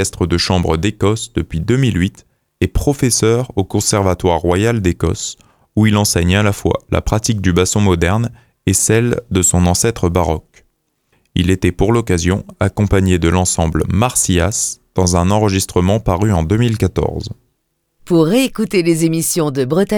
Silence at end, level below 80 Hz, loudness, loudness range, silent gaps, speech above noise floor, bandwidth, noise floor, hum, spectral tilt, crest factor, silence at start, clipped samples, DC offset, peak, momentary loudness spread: 0 s; -30 dBFS; -15 LUFS; 2 LU; none; 53 dB; 18.5 kHz; -67 dBFS; none; -5 dB/octave; 14 dB; 0 s; under 0.1%; under 0.1%; 0 dBFS; 6 LU